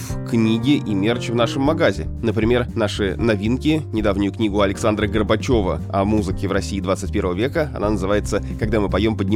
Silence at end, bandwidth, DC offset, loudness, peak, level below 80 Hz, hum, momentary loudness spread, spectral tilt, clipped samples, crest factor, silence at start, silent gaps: 0 s; 15.5 kHz; under 0.1%; -20 LUFS; -2 dBFS; -32 dBFS; none; 4 LU; -6.5 dB/octave; under 0.1%; 16 dB; 0 s; none